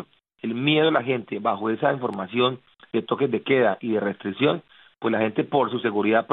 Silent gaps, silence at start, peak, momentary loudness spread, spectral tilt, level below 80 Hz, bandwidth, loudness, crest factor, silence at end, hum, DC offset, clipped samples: none; 0 s; -6 dBFS; 9 LU; -9 dB/octave; -72 dBFS; 4.2 kHz; -24 LUFS; 18 dB; 0 s; none; under 0.1%; under 0.1%